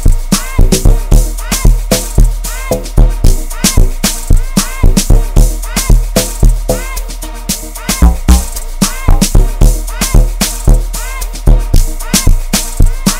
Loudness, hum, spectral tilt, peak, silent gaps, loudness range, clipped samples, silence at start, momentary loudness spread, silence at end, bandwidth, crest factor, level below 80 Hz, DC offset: -13 LUFS; none; -4.5 dB/octave; 0 dBFS; none; 1 LU; 0.2%; 0 s; 6 LU; 0 s; 16.5 kHz; 8 dB; -10 dBFS; 0.9%